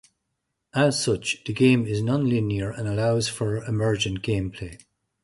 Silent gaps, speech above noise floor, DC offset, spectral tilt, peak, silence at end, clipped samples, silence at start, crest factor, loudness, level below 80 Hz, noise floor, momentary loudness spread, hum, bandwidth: none; 56 dB; under 0.1%; -5.5 dB/octave; -6 dBFS; 0.5 s; under 0.1%; 0.75 s; 18 dB; -24 LUFS; -48 dBFS; -79 dBFS; 8 LU; none; 11.5 kHz